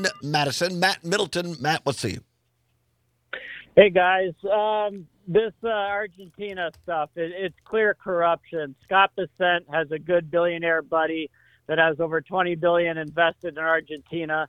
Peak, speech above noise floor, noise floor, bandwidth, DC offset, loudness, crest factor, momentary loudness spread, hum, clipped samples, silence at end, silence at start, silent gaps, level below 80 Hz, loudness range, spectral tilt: -2 dBFS; 46 dB; -70 dBFS; 15 kHz; under 0.1%; -23 LUFS; 22 dB; 12 LU; none; under 0.1%; 0 s; 0 s; none; -62 dBFS; 4 LU; -4.5 dB/octave